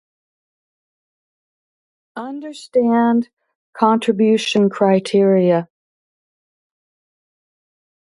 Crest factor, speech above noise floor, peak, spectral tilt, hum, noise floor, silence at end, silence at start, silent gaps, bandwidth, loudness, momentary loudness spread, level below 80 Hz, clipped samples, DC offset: 20 dB; over 74 dB; 0 dBFS; -6.5 dB/octave; none; under -90 dBFS; 2.4 s; 2.15 s; 3.33-3.37 s, 3.55-3.73 s; 11.5 kHz; -16 LUFS; 16 LU; -70 dBFS; under 0.1%; under 0.1%